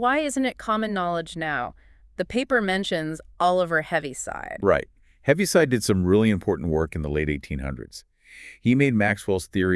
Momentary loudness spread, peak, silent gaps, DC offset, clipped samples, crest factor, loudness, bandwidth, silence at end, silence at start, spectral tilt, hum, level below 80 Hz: 13 LU; -4 dBFS; none; under 0.1%; under 0.1%; 20 dB; -24 LUFS; 12 kHz; 0 s; 0 s; -5.5 dB/octave; none; -44 dBFS